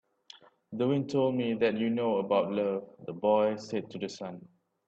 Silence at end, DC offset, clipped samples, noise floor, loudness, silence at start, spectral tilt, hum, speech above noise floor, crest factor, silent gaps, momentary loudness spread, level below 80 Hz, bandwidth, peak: 0.4 s; under 0.1%; under 0.1%; -56 dBFS; -30 LUFS; 0.7 s; -7 dB/octave; none; 27 dB; 18 dB; none; 14 LU; -74 dBFS; 8 kHz; -14 dBFS